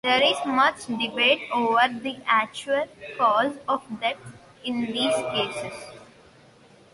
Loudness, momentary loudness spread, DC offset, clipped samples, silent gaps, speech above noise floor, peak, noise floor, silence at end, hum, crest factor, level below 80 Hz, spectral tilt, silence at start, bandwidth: -24 LUFS; 14 LU; under 0.1%; under 0.1%; none; 29 dB; -6 dBFS; -53 dBFS; 0.9 s; none; 18 dB; -66 dBFS; -3 dB/octave; 0.05 s; 11.5 kHz